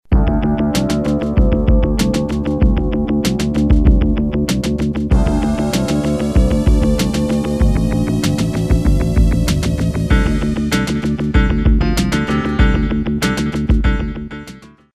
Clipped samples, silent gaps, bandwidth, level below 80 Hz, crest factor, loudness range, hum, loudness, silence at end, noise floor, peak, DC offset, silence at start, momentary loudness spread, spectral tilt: under 0.1%; none; 14.5 kHz; -18 dBFS; 14 dB; 1 LU; none; -16 LUFS; 0.25 s; -38 dBFS; 0 dBFS; 0.8%; 0.1 s; 4 LU; -6.5 dB/octave